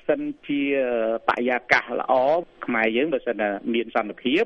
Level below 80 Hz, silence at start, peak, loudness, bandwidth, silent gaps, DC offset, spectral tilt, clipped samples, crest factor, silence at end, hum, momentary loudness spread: -60 dBFS; 0.1 s; -2 dBFS; -23 LUFS; 8.4 kHz; none; under 0.1%; -5.5 dB/octave; under 0.1%; 22 dB; 0 s; none; 6 LU